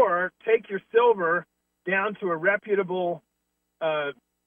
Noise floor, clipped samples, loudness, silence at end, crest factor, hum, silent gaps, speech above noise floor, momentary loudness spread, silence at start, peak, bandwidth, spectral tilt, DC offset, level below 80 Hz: -78 dBFS; under 0.1%; -25 LUFS; 0.35 s; 16 dB; none; none; 53 dB; 10 LU; 0 s; -8 dBFS; 3.7 kHz; -8 dB/octave; under 0.1%; -78 dBFS